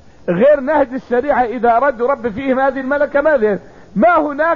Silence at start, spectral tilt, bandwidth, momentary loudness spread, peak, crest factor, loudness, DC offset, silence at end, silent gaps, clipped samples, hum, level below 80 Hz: 0.25 s; -8.5 dB/octave; 6.8 kHz; 6 LU; -4 dBFS; 12 dB; -15 LUFS; 0.6%; 0 s; none; under 0.1%; none; -44 dBFS